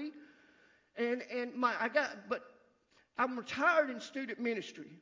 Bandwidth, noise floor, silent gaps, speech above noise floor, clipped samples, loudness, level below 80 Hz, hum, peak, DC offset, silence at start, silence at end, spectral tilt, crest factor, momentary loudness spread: 7.6 kHz; -71 dBFS; none; 36 dB; under 0.1%; -35 LUFS; -82 dBFS; none; -18 dBFS; under 0.1%; 0 s; 0 s; -4 dB/octave; 20 dB; 13 LU